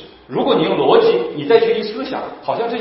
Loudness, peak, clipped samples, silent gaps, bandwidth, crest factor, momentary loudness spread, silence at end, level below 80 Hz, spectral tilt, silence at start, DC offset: -16 LUFS; 0 dBFS; under 0.1%; none; 5.8 kHz; 16 dB; 12 LU; 0 s; -56 dBFS; -9.5 dB/octave; 0 s; under 0.1%